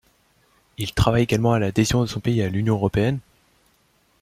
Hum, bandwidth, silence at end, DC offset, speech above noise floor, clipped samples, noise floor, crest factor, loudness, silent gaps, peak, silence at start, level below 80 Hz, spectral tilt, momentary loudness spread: none; 15.5 kHz; 1 s; under 0.1%; 42 dB; under 0.1%; -62 dBFS; 20 dB; -21 LUFS; none; -2 dBFS; 0.8 s; -40 dBFS; -6 dB/octave; 6 LU